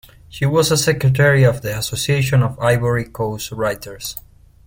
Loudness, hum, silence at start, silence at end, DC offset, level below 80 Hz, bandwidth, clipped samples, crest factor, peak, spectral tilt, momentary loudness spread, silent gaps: -17 LUFS; none; 0.3 s; 0.45 s; under 0.1%; -42 dBFS; 17 kHz; under 0.1%; 16 dB; -2 dBFS; -5 dB/octave; 14 LU; none